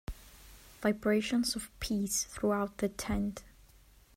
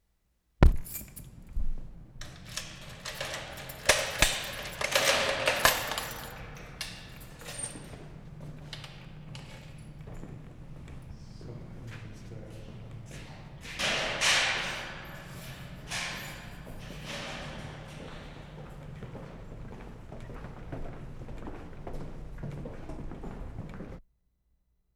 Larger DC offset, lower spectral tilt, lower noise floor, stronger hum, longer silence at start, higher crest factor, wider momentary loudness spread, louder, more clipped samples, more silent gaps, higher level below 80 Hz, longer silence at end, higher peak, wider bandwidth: neither; first, -4 dB/octave vs -2.5 dB/octave; second, -60 dBFS vs -73 dBFS; neither; second, 0.1 s vs 0.6 s; second, 18 dB vs 30 dB; about the same, 20 LU vs 21 LU; about the same, -33 LUFS vs -31 LUFS; neither; neither; second, -50 dBFS vs -40 dBFS; second, 0.65 s vs 0.95 s; second, -16 dBFS vs -4 dBFS; second, 16 kHz vs over 20 kHz